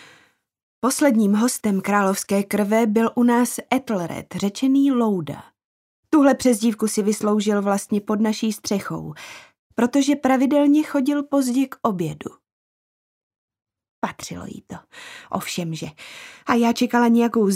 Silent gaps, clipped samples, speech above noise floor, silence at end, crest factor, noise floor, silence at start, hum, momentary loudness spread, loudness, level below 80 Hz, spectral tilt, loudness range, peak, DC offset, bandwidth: 5.65-6.03 s, 9.59-9.70 s, 12.52-13.31 s, 13.38-13.48 s, 13.89-14.02 s; under 0.1%; 37 dB; 0 s; 18 dB; -57 dBFS; 0.85 s; none; 18 LU; -20 LUFS; -62 dBFS; -5 dB/octave; 12 LU; -4 dBFS; under 0.1%; 16 kHz